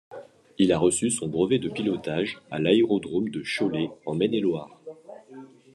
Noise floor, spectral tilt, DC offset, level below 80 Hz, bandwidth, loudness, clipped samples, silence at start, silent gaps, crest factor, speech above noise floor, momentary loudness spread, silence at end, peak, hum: -47 dBFS; -5 dB/octave; under 0.1%; -62 dBFS; 12 kHz; -25 LUFS; under 0.1%; 0.1 s; none; 20 dB; 22 dB; 23 LU; 0.3 s; -6 dBFS; none